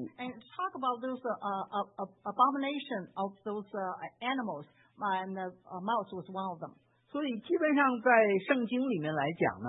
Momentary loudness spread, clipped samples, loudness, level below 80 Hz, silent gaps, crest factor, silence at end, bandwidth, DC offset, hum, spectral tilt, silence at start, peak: 14 LU; under 0.1%; -33 LUFS; -82 dBFS; none; 20 dB; 0 s; 3.9 kHz; under 0.1%; none; -1 dB/octave; 0 s; -12 dBFS